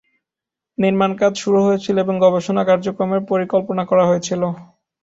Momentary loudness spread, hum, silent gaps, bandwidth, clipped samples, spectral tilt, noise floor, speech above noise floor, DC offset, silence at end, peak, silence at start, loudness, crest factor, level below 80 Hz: 6 LU; none; none; 8 kHz; under 0.1%; -6 dB/octave; -86 dBFS; 70 dB; under 0.1%; 0.4 s; -2 dBFS; 0.8 s; -17 LUFS; 16 dB; -60 dBFS